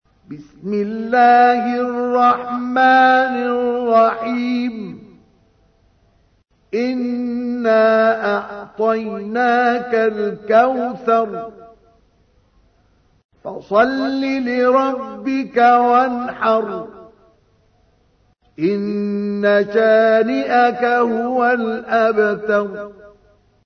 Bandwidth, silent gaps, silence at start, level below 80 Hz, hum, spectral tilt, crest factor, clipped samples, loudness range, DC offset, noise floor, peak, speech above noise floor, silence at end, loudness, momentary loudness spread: 6.4 kHz; 13.25-13.29 s; 0.3 s; -60 dBFS; none; -6.5 dB/octave; 16 dB; under 0.1%; 8 LU; under 0.1%; -58 dBFS; -2 dBFS; 42 dB; 0.6 s; -16 LUFS; 13 LU